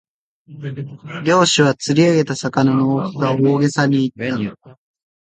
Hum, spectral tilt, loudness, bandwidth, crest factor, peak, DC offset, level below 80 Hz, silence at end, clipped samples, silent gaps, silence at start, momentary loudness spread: none; -5.5 dB/octave; -16 LUFS; 9.4 kHz; 16 dB; 0 dBFS; under 0.1%; -58 dBFS; 0.6 s; under 0.1%; none; 0.5 s; 15 LU